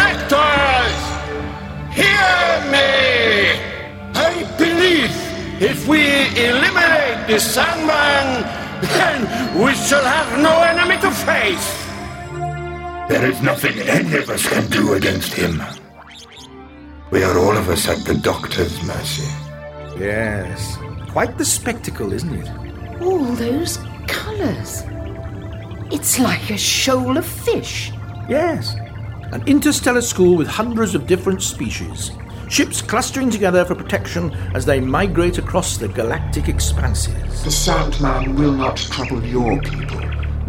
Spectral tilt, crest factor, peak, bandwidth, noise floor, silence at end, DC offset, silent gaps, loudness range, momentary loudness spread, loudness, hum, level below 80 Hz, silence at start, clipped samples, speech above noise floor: -4 dB/octave; 16 dB; -2 dBFS; 16.5 kHz; -39 dBFS; 0 s; under 0.1%; none; 7 LU; 14 LU; -17 LUFS; none; -30 dBFS; 0 s; under 0.1%; 22 dB